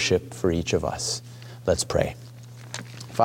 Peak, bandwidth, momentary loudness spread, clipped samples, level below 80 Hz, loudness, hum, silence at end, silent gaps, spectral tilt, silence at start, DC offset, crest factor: -6 dBFS; 17 kHz; 18 LU; under 0.1%; -46 dBFS; -27 LUFS; none; 0 s; none; -4 dB/octave; 0 s; under 0.1%; 20 dB